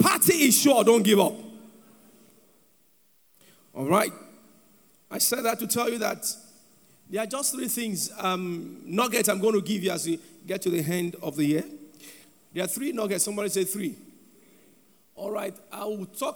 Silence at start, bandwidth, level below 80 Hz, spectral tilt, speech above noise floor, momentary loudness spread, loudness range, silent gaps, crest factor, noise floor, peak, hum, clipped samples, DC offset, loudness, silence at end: 0 s; over 20 kHz; -74 dBFS; -3.5 dB/octave; 38 dB; 17 LU; 5 LU; none; 22 dB; -64 dBFS; -6 dBFS; none; under 0.1%; under 0.1%; -25 LUFS; 0 s